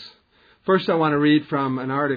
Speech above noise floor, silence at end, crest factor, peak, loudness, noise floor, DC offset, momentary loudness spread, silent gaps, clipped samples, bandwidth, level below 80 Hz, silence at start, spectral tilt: 38 dB; 0 s; 16 dB; -6 dBFS; -20 LUFS; -58 dBFS; under 0.1%; 6 LU; none; under 0.1%; 5 kHz; -62 dBFS; 0 s; -9 dB/octave